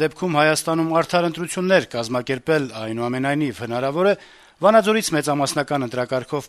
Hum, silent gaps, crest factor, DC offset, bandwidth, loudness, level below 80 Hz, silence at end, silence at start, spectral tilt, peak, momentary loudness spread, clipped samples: none; none; 18 dB; under 0.1%; 13.5 kHz; -20 LUFS; -60 dBFS; 0 s; 0 s; -4.5 dB/octave; -2 dBFS; 8 LU; under 0.1%